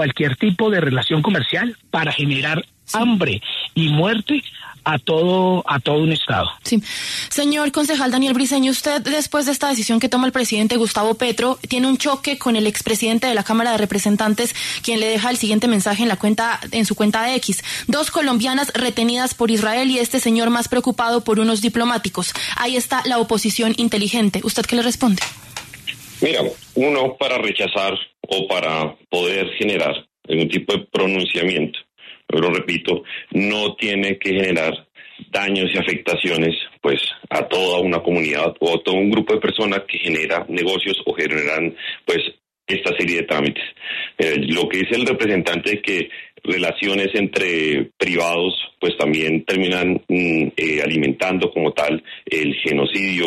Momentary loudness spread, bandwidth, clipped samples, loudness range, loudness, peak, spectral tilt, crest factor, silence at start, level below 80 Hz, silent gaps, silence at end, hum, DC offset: 5 LU; 14 kHz; under 0.1%; 2 LU; -19 LUFS; -4 dBFS; -4 dB/octave; 14 dB; 0 s; -54 dBFS; none; 0 s; none; under 0.1%